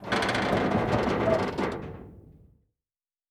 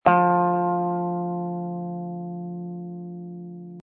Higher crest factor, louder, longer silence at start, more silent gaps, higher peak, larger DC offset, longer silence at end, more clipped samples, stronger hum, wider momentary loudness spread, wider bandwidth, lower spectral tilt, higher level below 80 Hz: about the same, 18 dB vs 22 dB; about the same, -27 LUFS vs -26 LUFS; about the same, 0 s vs 0.05 s; neither; second, -10 dBFS vs -4 dBFS; neither; first, 1 s vs 0 s; neither; neither; second, 13 LU vs 17 LU; first, 14.5 kHz vs 3.8 kHz; second, -6 dB/octave vs -11.5 dB/octave; first, -48 dBFS vs -68 dBFS